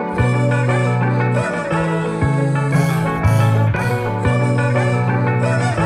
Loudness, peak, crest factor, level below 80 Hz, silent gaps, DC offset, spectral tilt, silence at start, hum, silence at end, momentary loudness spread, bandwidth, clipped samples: -17 LUFS; -2 dBFS; 14 dB; -38 dBFS; none; under 0.1%; -7.5 dB/octave; 0 s; none; 0 s; 3 LU; 13.5 kHz; under 0.1%